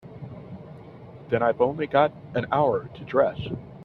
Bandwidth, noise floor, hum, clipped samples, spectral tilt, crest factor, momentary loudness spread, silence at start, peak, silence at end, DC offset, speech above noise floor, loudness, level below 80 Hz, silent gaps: 4.8 kHz; -44 dBFS; none; under 0.1%; -9 dB/octave; 20 dB; 21 LU; 0.05 s; -6 dBFS; 0 s; under 0.1%; 20 dB; -25 LUFS; -56 dBFS; none